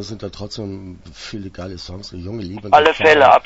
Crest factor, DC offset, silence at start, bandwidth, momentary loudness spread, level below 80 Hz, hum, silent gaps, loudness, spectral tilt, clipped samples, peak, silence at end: 18 dB; under 0.1%; 0 s; 8 kHz; 21 LU; -46 dBFS; none; none; -12 LUFS; -4.5 dB/octave; under 0.1%; 0 dBFS; 0.05 s